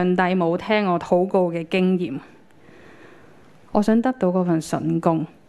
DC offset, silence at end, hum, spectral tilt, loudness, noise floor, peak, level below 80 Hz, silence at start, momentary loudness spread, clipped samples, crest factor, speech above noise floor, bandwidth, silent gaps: under 0.1%; 0.2 s; none; -7 dB/octave; -21 LUFS; -50 dBFS; -2 dBFS; -58 dBFS; 0 s; 5 LU; under 0.1%; 18 dB; 30 dB; 12 kHz; none